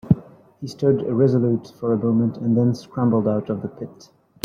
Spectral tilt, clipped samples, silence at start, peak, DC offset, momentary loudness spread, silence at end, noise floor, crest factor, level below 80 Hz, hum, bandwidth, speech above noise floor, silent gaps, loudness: -9.5 dB/octave; under 0.1%; 0.05 s; -2 dBFS; under 0.1%; 15 LU; 0.55 s; -40 dBFS; 18 dB; -54 dBFS; none; 7 kHz; 20 dB; none; -21 LUFS